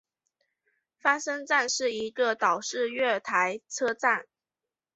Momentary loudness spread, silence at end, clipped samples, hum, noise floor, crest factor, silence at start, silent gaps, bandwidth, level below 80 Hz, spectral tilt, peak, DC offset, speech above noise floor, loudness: 5 LU; 0.75 s; under 0.1%; none; under -90 dBFS; 22 dB; 1.05 s; none; 8.2 kHz; -78 dBFS; -1.5 dB/octave; -8 dBFS; under 0.1%; over 63 dB; -27 LUFS